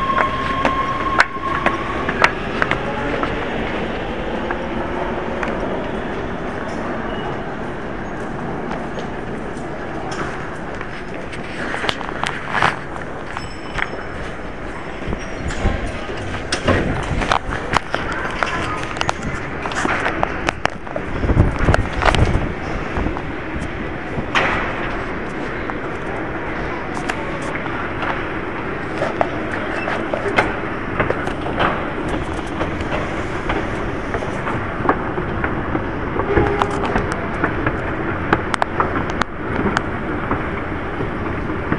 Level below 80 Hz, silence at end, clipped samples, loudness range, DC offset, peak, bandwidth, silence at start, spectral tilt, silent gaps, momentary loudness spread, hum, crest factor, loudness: -32 dBFS; 0 s; under 0.1%; 6 LU; 2%; 0 dBFS; 12 kHz; 0 s; -5.5 dB/octave; none; 9 LU; none; 22 dB; -22 LUFS